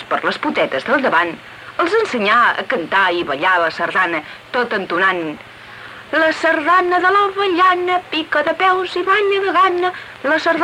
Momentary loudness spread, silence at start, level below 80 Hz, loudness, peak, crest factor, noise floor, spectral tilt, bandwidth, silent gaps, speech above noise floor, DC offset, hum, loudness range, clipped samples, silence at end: 10 LU; 0 s; -60 dBFS; -16 LUFS; -4 dBFS; 14 dB; -36 dBFS; -4 dB/octave; 13.5 kHz; none; 20 dB; under 0.1%; none; 3 LU; under 0.1%; 0 s